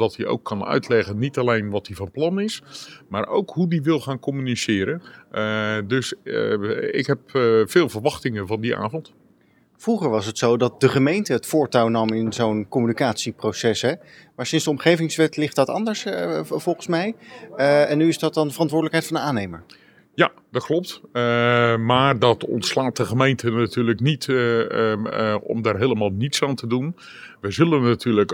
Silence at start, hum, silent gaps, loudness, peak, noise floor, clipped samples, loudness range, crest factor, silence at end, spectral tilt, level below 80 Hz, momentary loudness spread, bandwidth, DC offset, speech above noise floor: 0 s; none; none; -21 LUFS; -2 dBFS; -58 dBFS; under 0.1%; 4 LU; 20 dB; 0 s; -5.5 dB/octave; -64 dBFS; 10 LU; 17.5 kHz; under 0.1%; 37 dB